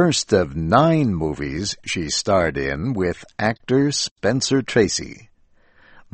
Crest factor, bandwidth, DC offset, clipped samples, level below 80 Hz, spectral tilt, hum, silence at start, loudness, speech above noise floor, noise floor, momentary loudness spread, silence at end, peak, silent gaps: 20 dB; 8.8 kHz; under 0.1%; under 0.1%; -42 dBFS; -4.5 dB/octave; none; 0 s; -20 LUFS; 35 dB; -55 dBFS; 8 LU; 1 s; 0 dBFS; 4.11-4.16 s